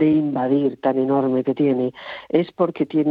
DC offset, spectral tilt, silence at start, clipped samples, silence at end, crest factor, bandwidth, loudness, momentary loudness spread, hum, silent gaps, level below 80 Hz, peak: under 0.1%; -10 dB/octave; 0 s; under 0.1%; 0 s; 16 dB; 4.9 kHz; -20 LUFS; 4 LU; none; none; -66 dBFS; -4 dBFS